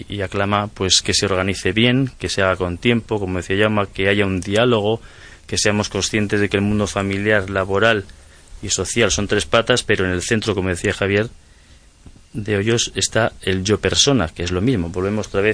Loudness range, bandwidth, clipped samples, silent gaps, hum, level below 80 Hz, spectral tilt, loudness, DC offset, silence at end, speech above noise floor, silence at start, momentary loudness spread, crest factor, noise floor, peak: 3 LU; 10.5 kHz; under 0.1%; none; none; -40 dBFS; -4 dB/octave; -18 LUFS; under 0.1%; 0 s; 29 dB; 0 s; 6 LU; 18 dB; -47 dBFS; 0 dBFS